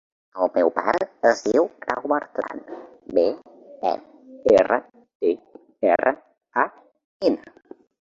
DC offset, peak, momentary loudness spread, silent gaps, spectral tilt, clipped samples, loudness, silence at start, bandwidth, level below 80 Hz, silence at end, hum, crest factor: under 0.1%; -2 dBFS; 13 LU; 5.15-5.20 s, 7.04-7.20 s; -5 dB/octave; under 0.1%; -23 LUFS; 0.35 s; 7.6 kHz; -62 dBFS; 0.7 s; none; 20 dB